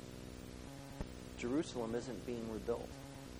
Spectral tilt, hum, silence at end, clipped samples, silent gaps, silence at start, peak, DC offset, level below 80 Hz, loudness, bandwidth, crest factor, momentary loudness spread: -5.5 dB/octave; none; 0 s; under 0.1%; none; 0 s; -26 dBFS; under 0.1%; -56 dBFS; -44 LUFS; over 20 kHz; 18 dB; 12 LU